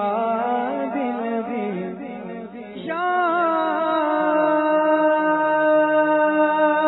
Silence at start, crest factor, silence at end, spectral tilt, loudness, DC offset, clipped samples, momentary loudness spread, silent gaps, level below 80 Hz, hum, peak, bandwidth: 0 s; 12 dB; 0 s; -9.5 dB/octave; -20 LUFS; under 0.1%; under 0.1%; 14 LU; none; -66 dBFS; none; -8 dBFS; 4.1 kHz